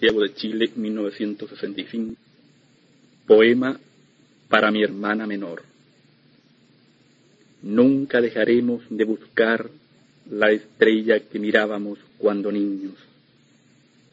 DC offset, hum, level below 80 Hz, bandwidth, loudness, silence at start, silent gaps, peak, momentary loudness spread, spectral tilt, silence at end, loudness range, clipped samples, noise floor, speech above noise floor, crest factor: under 0.1%; none; -66 dBFS; 7.8 kHz; -21 LUFS; 0 s; none; -2 dBFS; 15 LU; -7 dB/octave; 1.2 s; 4 LU; under 0.1%; -57 dBFS; 37 dB; 22 dB